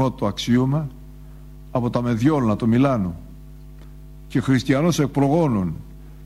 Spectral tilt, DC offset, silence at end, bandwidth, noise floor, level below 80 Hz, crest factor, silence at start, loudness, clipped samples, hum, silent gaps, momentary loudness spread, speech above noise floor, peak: -7 dB/octave; under 0.1%; 0 s; 14 kHz; -40 dBFS; -42 dBFS; 16 dB; 0 s; -21 LUFS; under 0.1%; none; none; 10 LU; 20 dB; -6 dBFS